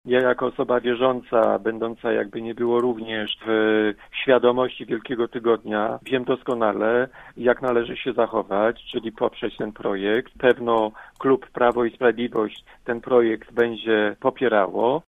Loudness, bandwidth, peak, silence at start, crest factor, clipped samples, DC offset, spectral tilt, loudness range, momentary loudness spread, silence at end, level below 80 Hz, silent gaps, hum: -22 LUFS; 8 kHz; -2 dBFS; 0.05 s; 20 dB; under 0.1%; under 0.1%; -7 dB/octave; 2 LU; 8 LU; 0.05 s; -56 dBFS; none; none